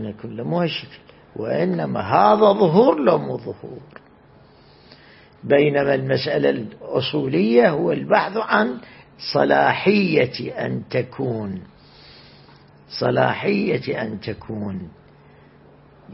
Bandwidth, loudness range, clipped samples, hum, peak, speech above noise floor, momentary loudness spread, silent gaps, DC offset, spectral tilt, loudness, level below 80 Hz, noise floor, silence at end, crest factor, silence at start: 5.8 kHz; 6 LU; under 0.1%; none; 0 dBFS; 30 dB; 17 LU; none; under 0.1%; -10 dB/octave; -20 LUFS; -58 dBFS; -50 dBFS; 0 s; 20 dB; 0 s